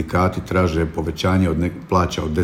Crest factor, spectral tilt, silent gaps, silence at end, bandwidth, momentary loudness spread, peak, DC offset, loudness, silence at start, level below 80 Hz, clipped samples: 16 dB; -6.5 dB/octave; none; 0 s; 15 kHz; 4 LU; -4 dBFS; under 0.1%; -20 LUFS; 0 s; -38 dBFS; under 0.1%